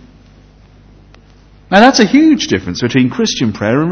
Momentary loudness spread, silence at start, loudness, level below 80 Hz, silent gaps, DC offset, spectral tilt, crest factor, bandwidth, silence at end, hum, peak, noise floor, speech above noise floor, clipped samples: 8 LU; 1.7 s; -11 LUFS; -42 dBFS; none; under 0.1%; -5 dB/octave; 12 dB; 8 kHz; 0 s; none; 0 dBFS; -42 dBFS; 32 dB; 0.5%